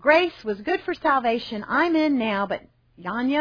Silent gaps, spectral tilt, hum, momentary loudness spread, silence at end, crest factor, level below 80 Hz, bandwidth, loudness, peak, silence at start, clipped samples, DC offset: none; -6 dB/octave; none; 10 LU; 0 s; 18 dB; -58 dBFS; 5.4 kHz; -23 LUFS; -4 dBFS; 0 s; under 0.1%; under 0.1%